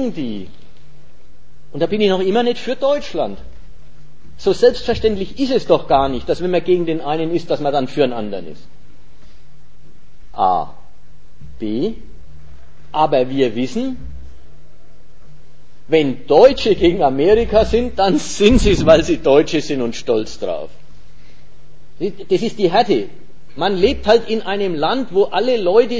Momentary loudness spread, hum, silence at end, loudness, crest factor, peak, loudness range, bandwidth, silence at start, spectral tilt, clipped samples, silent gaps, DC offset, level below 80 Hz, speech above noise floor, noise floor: 13 LU; none; 0 s; -16 LUFS; 18 dB; 0 dBFS; 9 LU; 8 kHz; 0 s; -5.5 dB/octave; under 0.1%; none; 6%; -34 dBFS; 33 dB; -49 dBFS